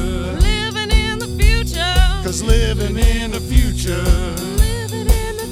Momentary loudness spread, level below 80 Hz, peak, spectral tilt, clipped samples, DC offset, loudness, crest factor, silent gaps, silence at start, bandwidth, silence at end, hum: 4 LU; -16 dBFS; 0 dBFS; -4.5 dB/octave; under 0.1%; under 0.1%; -18 LUFS; 16 dB; none; 0 s; 16 kHz; 0 s; none